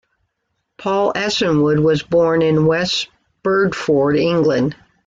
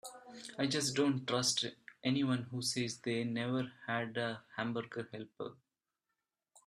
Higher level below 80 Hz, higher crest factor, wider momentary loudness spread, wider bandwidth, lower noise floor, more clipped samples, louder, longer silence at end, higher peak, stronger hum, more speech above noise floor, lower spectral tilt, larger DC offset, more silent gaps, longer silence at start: first, -50 dBFS vs -76 dBFS; second, 12 dB vs 18 dB; second, 7 LU vs 15 LU; second, 7.8 kHz vs 13 kHz; second, -72 dBFS vs -89 dBFS; neither; first, -16 LUFS vs -36 LUFS; second, 0.35 s vs 1.15 s; first, -6 dBFS vs -20 dBFS; neither; first, 57 dB vs 52 dB; first, -6 dB/octave vs -4 dB/octave; neither; neither; first, 0.8 s vs 0.05 s